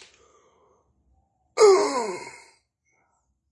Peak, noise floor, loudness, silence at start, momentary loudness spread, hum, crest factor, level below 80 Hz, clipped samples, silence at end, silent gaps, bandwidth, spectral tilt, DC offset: -6 dBFS; -71 dBFS; -21 LUFS; 1.55 s; 20 LU; none; 20 dB; -72 dBFS; under 0.1%; 1.2 s; none; 11.5 kHz; -2.5 dB/octave; under 0.1%